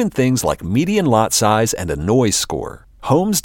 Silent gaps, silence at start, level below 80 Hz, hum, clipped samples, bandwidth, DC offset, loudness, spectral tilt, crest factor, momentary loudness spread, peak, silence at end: none; 0 s; -40 dBFS; none; under 0.1%; 17 kHz; under 0.1%; -17 LUFS; -4.5 dB/octave; 14 dB; 9 LU; -2 dBFS; 0.05 s